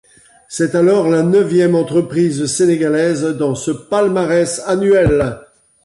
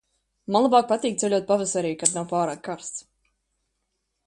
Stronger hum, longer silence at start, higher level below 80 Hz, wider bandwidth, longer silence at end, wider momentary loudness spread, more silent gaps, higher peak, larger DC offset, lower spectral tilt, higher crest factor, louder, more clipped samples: neither; about the same, 0.5 s vs 0.5 s; first, -40 dBFS vs -66 dBFS; about the same, 11.5 kHz vs 11.5 kHz; second, 0.45 s vs 1.25 s; second, 6 LU vs 15 LU; neither; second, -4 dBFS vs 0 dBFS; neither; first, -6 dB/octave vs -4 dB/octave; second, 12 dB vs 24 dB; first, -14 LUFS vs -23 LUFS; neither